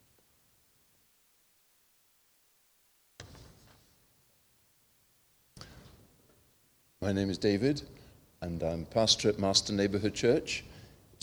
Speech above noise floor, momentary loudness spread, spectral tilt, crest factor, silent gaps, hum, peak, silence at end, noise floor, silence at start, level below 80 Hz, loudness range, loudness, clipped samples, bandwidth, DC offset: 38 dB; 26 LU; -4 dB/octave; 24 dB; none; none; -10 dBFS; 0.35 s; -68 dBFS; 3.2 s; -60 dBFS; 9 LU; -30 LUFS; under 0.1%; over 20 kHz; under 0.1%